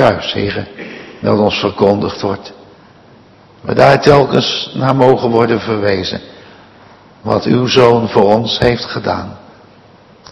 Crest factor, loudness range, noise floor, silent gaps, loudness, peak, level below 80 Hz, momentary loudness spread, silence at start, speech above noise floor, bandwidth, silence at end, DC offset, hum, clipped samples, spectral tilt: 14 dB; 4 LU; -43 dBFS; none; -12 LUFS; 0 dBFS; -42 dBFS; 17 LU; 0 s; 31 dB; 12 kHz; 0.95 s; under 0.1%; none; 0.8%; -6 dB/octave